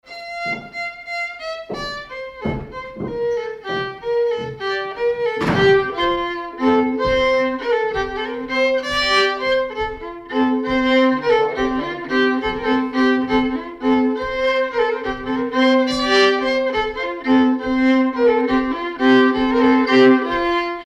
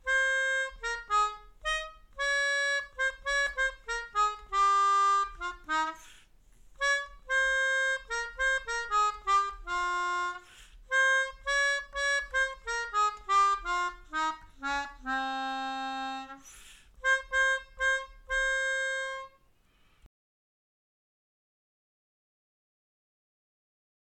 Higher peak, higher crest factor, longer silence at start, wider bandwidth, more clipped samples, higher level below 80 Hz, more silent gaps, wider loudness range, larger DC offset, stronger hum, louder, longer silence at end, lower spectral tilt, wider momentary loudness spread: first, -4 dBFS vs -18 dBFS; about the same, 14 dB vs 14 dB; about the same, 0.05 s vs 0.05 s; second, 8.6 kHz vs 12.5 kHz; neither; first, -44 dBFS vs -54 dBFS; neither; about the same, 8 LU vs 6 LU; neither; neither; first, -18 LUFS vs -29 LUFS; second, 0 s vs 3.95 s; first, -5 dB/octave vs -0.5 dB/octave; first, 12 LU vs 9 LU